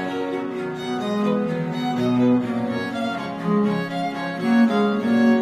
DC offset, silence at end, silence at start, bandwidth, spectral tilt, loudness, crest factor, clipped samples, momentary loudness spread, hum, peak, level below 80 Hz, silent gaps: under 0.1%; 0 s; 0 s; 10.5 kHz; -7 dB/octave; -22 LUFS; 14 dB; under 0.1%; 8 LU; none; -6 dBFS; -62 dBFS; none